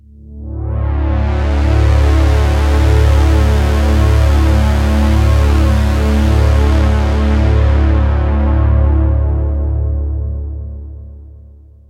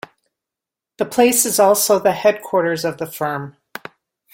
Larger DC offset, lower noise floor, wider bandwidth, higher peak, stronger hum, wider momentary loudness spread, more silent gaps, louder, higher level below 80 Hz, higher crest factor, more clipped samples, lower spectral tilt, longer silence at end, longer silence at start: neither; second, -38 dBFS vs -86 dBFS; second, 9.2 kHz vs 17 kHz; about the same, 0 dBFS vs -2 dBFS; neither; second, 10 LU vs 20 LU; neither; first, -13 LUFS vs -17 LUFS; first, -14 dBFS vs -62 dBFS; second, 10 dB vs 18 dB; neither; first, -7.5 dB/octave vs -3 dB/octave; second, 0.5 s vs 0.85 s; second, 0.25 s vs 1 s